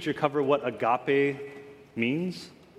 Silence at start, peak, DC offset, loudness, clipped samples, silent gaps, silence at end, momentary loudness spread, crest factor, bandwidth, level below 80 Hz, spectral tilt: 0 s; -8 dBFS; under 0.1%; -27 LUFS; under 0.1%; none; 0.25 s; 17 LU; 20 dB; 12.5 kHz; -72 dBFS; -6.5 dB/octave